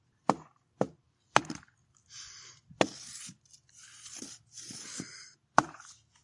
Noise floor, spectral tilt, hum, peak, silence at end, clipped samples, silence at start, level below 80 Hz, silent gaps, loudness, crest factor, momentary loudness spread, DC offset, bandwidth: -64 dBFS; -3 dB/octave; none; 0 dBFS; 0.3 s; under 0.1%; 0.3 s; -72 dBFS; none; -35 LUFS; 36 dB; 21 LU; under 0.1%; 11.5 kHz